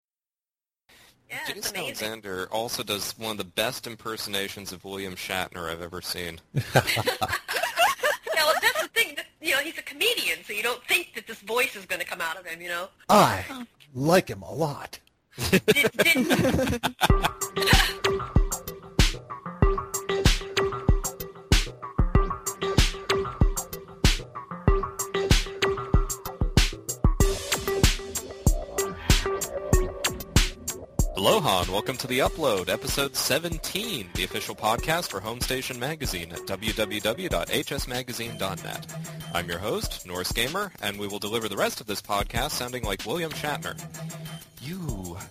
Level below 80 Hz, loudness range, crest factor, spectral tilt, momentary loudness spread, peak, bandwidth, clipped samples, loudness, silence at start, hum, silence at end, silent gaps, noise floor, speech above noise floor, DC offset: -32 dBFS; 7 LU; 22 dB; -3.5 dB/octave; 12 LU; -4 dBFS; 15.5 kHz; under 0.1%; -26 LUFS; 1.3 s; none; 0 s; none; under -90 dBFS; over 63 dB; under 0.1%